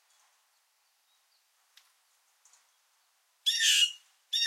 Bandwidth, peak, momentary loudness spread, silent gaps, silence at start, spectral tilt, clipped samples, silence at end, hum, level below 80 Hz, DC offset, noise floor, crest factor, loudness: 16.5 kHz; -14 dBFS; 12 LU; none; 3.45 s; 11.5 dB/octave; under 0.1%; 0 s; none; under -90 dBFS; under 0.1%; -72 dBFS; 22 dB; -25 LUFS